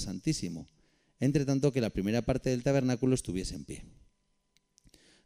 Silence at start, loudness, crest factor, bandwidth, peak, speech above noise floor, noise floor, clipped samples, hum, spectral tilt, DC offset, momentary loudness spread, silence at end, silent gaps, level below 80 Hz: 0 s; -31 LUFS; 18 dB; 15.5 kHz; -14 dBFS; 43 dB; -74 dBFS; under 0.1%; none; -6 dB/octave; under 0.1%; 14 LU; 1.35 s; none; -50 dBFS